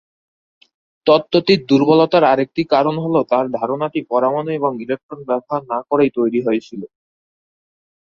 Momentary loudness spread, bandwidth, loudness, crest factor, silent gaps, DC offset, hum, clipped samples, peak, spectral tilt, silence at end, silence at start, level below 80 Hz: 10 LU; 7.2 kHz; -17 LUFS; 18 dB; 5.03-5.09 s; under 0.1%; none; under 0.1%; 0 dBFS; -7.5 dB/octave; 1.15 s; 1.05 s; -60 dBFS